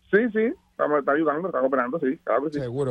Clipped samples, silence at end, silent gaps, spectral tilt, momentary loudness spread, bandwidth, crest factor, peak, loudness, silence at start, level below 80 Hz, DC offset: under 0.1%; 0 s; none; -8 dB/octave; 6 LU; 8.8 kHz; 16 dB; -8 dBFS; -24 LUFS; 0.1 s; -62 dBFS; under 0.1%